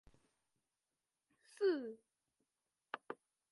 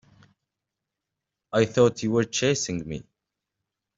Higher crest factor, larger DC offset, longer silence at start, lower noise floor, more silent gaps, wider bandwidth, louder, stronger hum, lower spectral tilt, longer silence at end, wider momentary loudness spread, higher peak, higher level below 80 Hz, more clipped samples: about the same, 24 dB vs 22 dB; neither; about the same, 1.6 s vs 1.55 s; first, under -90 dBFS vs -85 dBFS; neither; first, 11.5 kHz vs 8 kHz; second, -42 LUFS vs -24 LUFS; neither; about the same, -4.5 dB/octave vs -4.5 dB/octave; second, 0.35 s vs 0.95 s; first, 17 LU vs 13 LU; second, -24 dBFS vs -6 dBFS; second, -84 dBFS vs -60 dBFS; neither